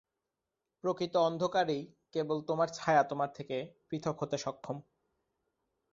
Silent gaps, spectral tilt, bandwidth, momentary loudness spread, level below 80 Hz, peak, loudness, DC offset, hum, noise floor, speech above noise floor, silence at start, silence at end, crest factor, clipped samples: none; -5.5 dB/octave; 7.8 kHz; 11 LU; -74 dBFS; -14 dBFS; -34 LUFS; under 0.1%; none; -88 dBFS; 55 dB; 0.85 s; 1.1 s; 22 dB; under 0.1%